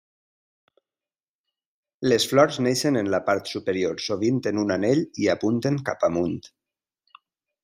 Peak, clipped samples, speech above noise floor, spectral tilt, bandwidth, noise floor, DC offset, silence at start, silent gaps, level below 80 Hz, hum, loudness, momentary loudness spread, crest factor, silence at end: -4 dBFS; under 0.1%; over 67 dB; -5 dB/octave; 15.5 kHz; under -90 dBFS; under 0.1%; 2 s; none; -66 dBFS; none; -23 LUFS; 7 LU; 22 dB; 1.15 s